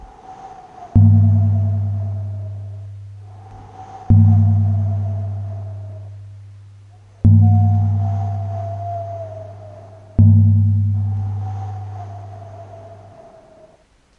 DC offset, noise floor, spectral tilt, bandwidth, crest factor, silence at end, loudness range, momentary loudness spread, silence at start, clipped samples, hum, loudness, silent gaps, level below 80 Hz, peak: under 0.1%; -53 dBFS; -11.5 dB/octave; 1.8 kHz; 16 dB; 1.25 s; 2 LU; 25 LU; 0 s; under 0.1%; none; -17 LUFS; none; -40 dBFS; 0 dBFS